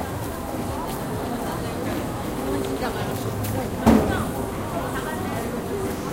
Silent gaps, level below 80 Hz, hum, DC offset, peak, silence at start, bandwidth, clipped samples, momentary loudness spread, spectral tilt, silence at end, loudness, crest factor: none; -38 dBFS; none; under 0.1%; -4 dBFS; 0 s; 17 kHz; under 0.1%; 9 LU; -6 dB/octave; 0 s; -26 LUFS; 22 dB